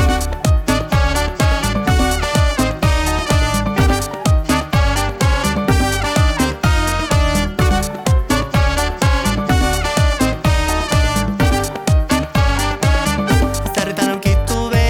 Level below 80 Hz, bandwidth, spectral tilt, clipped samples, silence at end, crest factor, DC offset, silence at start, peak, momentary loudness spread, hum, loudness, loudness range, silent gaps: -20 dBFS; 18 kHz; -5 dB/octave; under 0.1%; 0 s; 12 dB; under 0.1%; 0 s; -4 dBFS; 2 LU; none; -16 LUFS; 0 LU; none